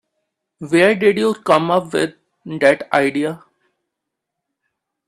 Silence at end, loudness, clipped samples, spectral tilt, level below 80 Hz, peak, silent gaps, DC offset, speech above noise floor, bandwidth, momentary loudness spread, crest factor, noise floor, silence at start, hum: 1.7 s; -16 LUFS; under 0.1%; -5.5 dB/octave; -62 dBFS; 0 dBFS; none; under 0.1%; 64 dB; 13.5 kHz; 12 LU; 18 dB; -80 dBFS; 0.6 s; none